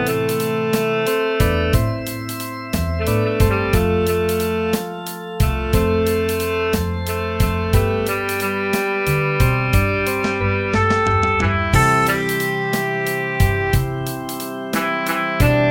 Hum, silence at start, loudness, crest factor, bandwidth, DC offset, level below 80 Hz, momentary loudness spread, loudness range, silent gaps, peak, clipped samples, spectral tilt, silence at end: none; 0 s; -19 LUFS; 16 dB; 17 kHz; under 0.1%; -28 dBFS; 7 LU; 3 LU; none; -2 dBFS; under 0.1%; -5.5 dB/octave; 0 s